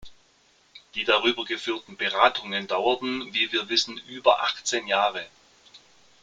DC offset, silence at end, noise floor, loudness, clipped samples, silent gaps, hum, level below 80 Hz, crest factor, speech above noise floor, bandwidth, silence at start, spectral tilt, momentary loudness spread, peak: under 0.1%; 0.45 s; -62 dBFS; -24 LUFS; under 0.1%; none; none; -64 dBFS; 24 dB; 36 dB; 9.6 kHz; 0 s; -1.5 dB/octave; 9 LU; -4 dBFS